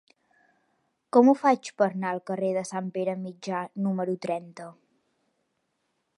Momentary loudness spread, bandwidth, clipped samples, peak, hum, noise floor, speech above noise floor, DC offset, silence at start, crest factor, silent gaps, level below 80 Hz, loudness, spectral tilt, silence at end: 14 LU; 11.5 kHz; under 0.1%; -6 dBFS; none; -77 dBFS; 51 dB; under 0.1%; 1.15 s; 22 dB; none; -84 dBFS; -26 LUFS; -6.5 dB/octave; 1.45 s